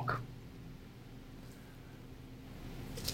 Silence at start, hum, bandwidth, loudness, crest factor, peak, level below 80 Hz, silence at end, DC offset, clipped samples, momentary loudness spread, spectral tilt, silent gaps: 0 s; none; 16.5 kHz; -48 LUFS; 26 dB; -20 dBFS; -56 dBFS; 0 s; under 0.1%; under 0.1%; 12 LU; -4.5 dB/octave; none